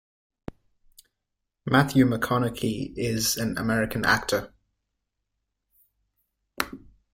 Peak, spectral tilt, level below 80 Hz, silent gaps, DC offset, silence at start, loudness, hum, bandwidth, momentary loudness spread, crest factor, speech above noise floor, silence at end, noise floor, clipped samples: -4 dBFS; -4.5 dB/octave; -52 dBFS; none; under 0.1%; 0.5 s; -25 LUFS; none; 16.5 kHz; 22 LU; 24 dB; 58 dB; 0.35 s; -82 dBFS; under 0.1%